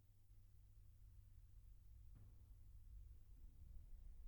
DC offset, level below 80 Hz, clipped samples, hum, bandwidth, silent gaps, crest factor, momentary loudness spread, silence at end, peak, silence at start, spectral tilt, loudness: under 0.1%; -62 dBFS; under 0.1%; none; 19.5 kHz; none; 14 dB; 4 LU; 0 s; -46 dBFS; 0 s; -6.5 dB/octave; -67 LUFS